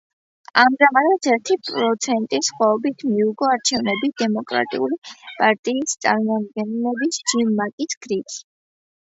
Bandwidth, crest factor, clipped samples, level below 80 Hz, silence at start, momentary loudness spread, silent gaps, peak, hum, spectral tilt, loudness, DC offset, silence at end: 8 kHz; 20 dB; under 0.1%; -68 dBFS; 0.55 s; 9 LU; 4.98-5.02 s, 5.59-5.63 s, 7.73-7.78 s, 7.97-8.01 s; 0 dBFS; none; -3 dB/octave; -20 LUFS; under 0.1%; 0.6 s